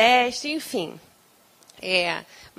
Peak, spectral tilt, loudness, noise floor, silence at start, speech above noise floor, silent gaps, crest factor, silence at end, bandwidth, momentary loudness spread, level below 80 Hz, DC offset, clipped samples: -4 dBFS; -2.5 dB/octave; -24 LUFS; -58 dBFS; 0 s; 34 dB; none; 20 dB; 0.15 s; 16 kHz; 14 LU; -66 dBFS; under 0.1%; under 0.1%